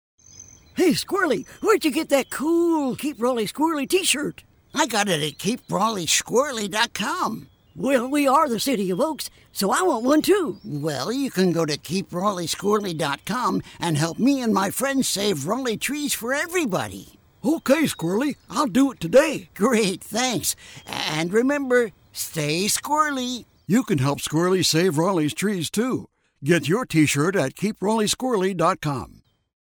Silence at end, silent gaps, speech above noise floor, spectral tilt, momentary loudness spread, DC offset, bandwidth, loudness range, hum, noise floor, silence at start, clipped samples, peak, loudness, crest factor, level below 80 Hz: 0.65 s; none; 25 dB; -4 dB/octave; 8 LU; under 0.1%; over 20 kHz; 2 LU; none; -47 dBFS; 0.35 s; under 0.1%; -6 dBFS; -22 LUFS; 16 dB; -58 dBFS